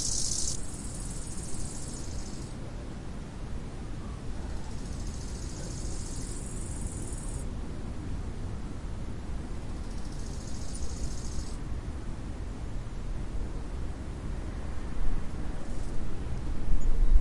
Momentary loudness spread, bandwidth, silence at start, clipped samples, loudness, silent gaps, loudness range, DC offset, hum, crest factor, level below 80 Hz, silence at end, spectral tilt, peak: 5 LU; 11.5 kHz; 0 s; under 0.1%; -38 LUFS; none; 2 LU; under 0.1%; none; 20 dB; -34 dBFS; 0 s; -4.5 dB/octave; -10 dBFS